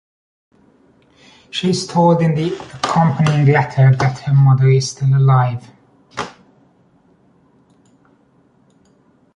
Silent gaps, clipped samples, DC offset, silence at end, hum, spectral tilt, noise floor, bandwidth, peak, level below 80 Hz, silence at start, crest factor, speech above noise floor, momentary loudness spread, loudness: none; under 0.1%; under 0.1%; 3.05 s; none; -6.5 dB/octave; -55 dBFS; 10.5 kHz; -2 dBFS; -52 dBFS; 1.55 s; 16 dB; 41 dB; 16 LU; -15 LUFS